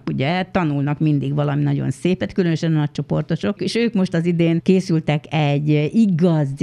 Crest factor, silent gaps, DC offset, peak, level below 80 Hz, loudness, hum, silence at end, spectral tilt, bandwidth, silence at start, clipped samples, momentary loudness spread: 16 dB; none; under 0.1%; -2 dBFS; -52 dBFS; -19 LUFS; none; 0 s; -7.5 dB/octave; 10.5 kHz; 0.05 s; under 0.1%; 5 LU